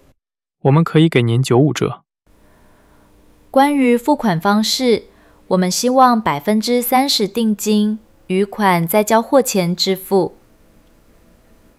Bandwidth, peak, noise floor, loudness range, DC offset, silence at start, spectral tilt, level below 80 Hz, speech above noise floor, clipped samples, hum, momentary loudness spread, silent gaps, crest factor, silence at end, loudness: 16.5 kHz; 0 dBFS; -70 dBFS; 2 LU; under 0.1%; 0.65 s; -5 dB/octave; -54 dBFS; 56 dB; under 0.1%; none; 7 LU; none; 16 dB; 1.5 s; -15 LUFS